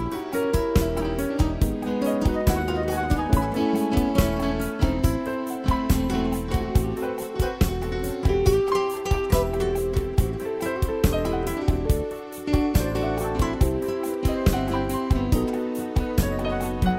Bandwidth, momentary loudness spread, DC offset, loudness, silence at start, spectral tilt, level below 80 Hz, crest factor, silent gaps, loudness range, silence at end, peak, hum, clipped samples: 16 kHz; 5 LU; under 0.1%; -25 LUFS; 0 s; -6.5 dB/octave; -28 dBFS; 18 dB; none; 2 LU; 0 s; -6 dBFS; none; under 0.1%